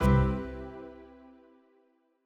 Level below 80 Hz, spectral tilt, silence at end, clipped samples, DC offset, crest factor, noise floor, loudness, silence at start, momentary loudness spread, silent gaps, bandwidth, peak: -38 dBFS; -8.5 dB/octave; 1.2 s; under 0.1%; under 0.1%; 20 dB; -69 dBFS; -31 LUFS; 0 s; 25 LU; none; 13.5 kHz; -12 dBFS